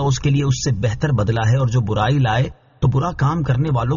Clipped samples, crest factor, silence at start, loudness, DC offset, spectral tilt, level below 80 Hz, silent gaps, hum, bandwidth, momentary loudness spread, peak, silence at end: under 0.1%; 12 dB; 0 s; -19 LUFS; under 0.1%; -6.5 dB/octave; -36 dBFS; none; none; 7.4 kHz; 3 LU; -6 dBFS; 0 s